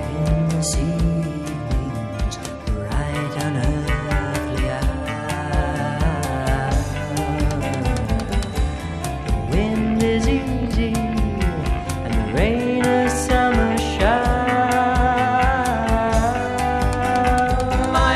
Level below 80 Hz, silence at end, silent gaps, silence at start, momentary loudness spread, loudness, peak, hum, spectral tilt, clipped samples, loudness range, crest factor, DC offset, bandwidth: -26 dBFS; 0 s; none; 0 s; 7 LU; -21 LUFS; -2 dBFS; none; -5.5 dB/octave; under 0.1%; 5 LU; 18 dB; 0.2%; 13.5 kHz